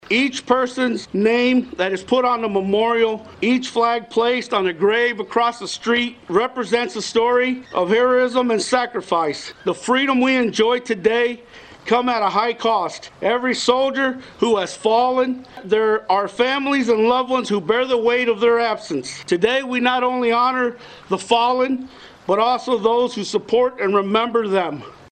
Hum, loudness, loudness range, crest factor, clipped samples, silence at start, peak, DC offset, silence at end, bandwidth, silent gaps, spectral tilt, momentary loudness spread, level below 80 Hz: none; -19 LUFS; 1 LU; 18 dB; under 0.1%; 0.1 s; -2 dBFS; under 0.1%; 0.2 s; 9.4 kHz; none; -4 dB/octave; 6 LU; -58 dBFS